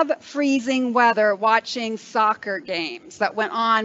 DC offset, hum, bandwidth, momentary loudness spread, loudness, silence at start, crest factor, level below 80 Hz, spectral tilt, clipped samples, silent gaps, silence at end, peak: under 0.1%; none; 8 kHz; 9 LU; -21 LUFS; 0 s; 18 dB; -74 dBFS; -3.5 dB/octave; under 0.1%; none; 0 s; -4 dBFS